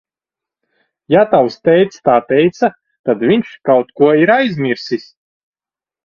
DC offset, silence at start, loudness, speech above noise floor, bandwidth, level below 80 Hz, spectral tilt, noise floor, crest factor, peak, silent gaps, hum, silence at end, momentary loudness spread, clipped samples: under 0.1%; 1.1 s; -13 LUFS; over 77 dB; 7 kHz; -58 dBFS; -7 dB/octave; under -90 dBFS; 14 dB; 0 dBFS; 2.99-3.04 s; none; 1.05 s; 8 LU; under 0.1%